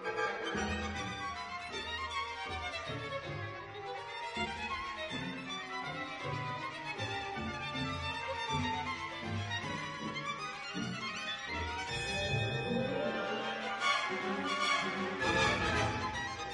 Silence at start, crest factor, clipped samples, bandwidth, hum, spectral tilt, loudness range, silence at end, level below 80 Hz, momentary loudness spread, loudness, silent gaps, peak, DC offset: 0 s; 20 dB; under 0.1%; 11.5 kHz; none; -4 dB/octave; 7 LU; 0 s; -56 dBFS; 8 LU; -36 LUFS; none; -18 dBFS; under 0.1%